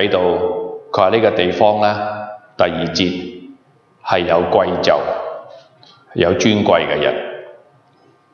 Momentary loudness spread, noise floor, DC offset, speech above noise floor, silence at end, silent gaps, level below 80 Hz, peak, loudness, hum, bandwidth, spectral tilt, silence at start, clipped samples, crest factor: 16 LU; -53 dBFS; under 0.1%; 38 dB; 0.75 s; none; -50 dBFS; 0 dBFS; -16 LUFS; none; 7.2 kHz; -5 dB/octave; 0 s; under 0.1%; 16 dB